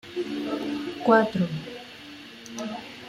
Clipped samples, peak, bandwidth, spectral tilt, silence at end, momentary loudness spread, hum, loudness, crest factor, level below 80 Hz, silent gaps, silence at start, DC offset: under 0.1%; -6 dBFS; 15 kHz; -6 dB/octave; 0 s; 21 LU; none; -26 LUFS; 22 dB; -64 dBFS; none; 0.05 s; under 0.1%